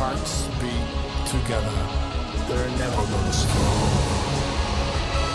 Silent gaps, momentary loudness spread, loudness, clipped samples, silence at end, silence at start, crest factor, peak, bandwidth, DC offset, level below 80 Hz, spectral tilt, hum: none; 6 LU; -24 LUFS; under 0.1%; 0 s; 0 s; 14 dB; -8 dBFS; 12 kHz; under 0.1%; -28 dBFS; -5 dB/octave; none